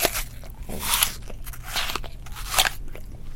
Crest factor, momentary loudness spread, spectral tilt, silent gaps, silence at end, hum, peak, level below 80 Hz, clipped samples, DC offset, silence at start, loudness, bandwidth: 26 dB; 19 LU; -1 dB/octave; none; 0 s; none; 0 dBFS; -36 dBFS; under 0.1%; under 0.1%; 0 s; -24 LUFS; 17 kHz